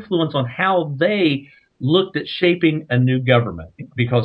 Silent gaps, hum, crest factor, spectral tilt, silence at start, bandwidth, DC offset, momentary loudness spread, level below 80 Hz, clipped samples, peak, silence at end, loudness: none; none; 18 dB; -9 dB/octave; 0 s; 5.4 kHz; under 0.1%; 10 LU; -54 dBFS; under 0.1%; 0 dBFS; 0 s; -18 LUFS